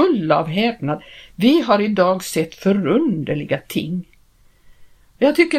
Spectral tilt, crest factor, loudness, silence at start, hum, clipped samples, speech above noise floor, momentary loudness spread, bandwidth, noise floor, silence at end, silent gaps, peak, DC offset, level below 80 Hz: -6 dB/octave; 18 dB; -19 LUFS; 0 s; none; under 0.1%; 35 dB; 10 LU; 16 kHz; -53 dBFS; 0 s; none; 0 dBFS; under 0.1%; -54 dBFS